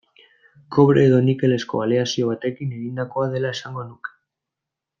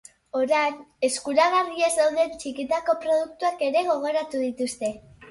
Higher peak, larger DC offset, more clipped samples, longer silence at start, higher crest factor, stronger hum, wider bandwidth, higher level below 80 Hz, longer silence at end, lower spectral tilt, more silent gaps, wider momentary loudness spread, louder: first, -2 dBFS vs -8 dBFS; neither; neither; first, 0.7 s vs 0.35 s; about the same, 18 dB vs 18 dB; neither; second, 7.4 kHz vs 11.5 kHz; about the same, -62 dBFS vs -64 dBFS; first, 0.9 s vs 0 s; first, -7 dB/octave vs -2 dB/octave; neither; first, 17 LU vs 8 LU; first, -20 LUFS vs -24 LUFS